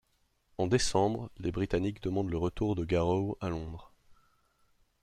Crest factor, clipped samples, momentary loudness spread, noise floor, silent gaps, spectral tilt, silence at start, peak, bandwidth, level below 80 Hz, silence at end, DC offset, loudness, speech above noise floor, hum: 20 dB; under 0.1%; 10 LU; -73 dBFS; none; -6 dB/octave; 0.6 s; -12 dBFS; 13 kHz; -50 dBFS; 0.9 s; under 0.1%; -32 LUFS; 42 dB; none